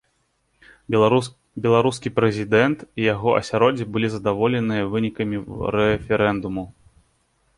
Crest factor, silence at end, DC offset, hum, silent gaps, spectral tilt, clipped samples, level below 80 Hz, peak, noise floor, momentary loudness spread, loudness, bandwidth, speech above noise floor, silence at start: 20 dB; 0.85 s; under 0.1%; none; none; -6.5 dB/octave; under 0.1%; -48 dBFS; -2 dBFS; -68 dBFS; 8 LU; -21 LUFS; 11.5 kHz; 48 dB; 0.9 s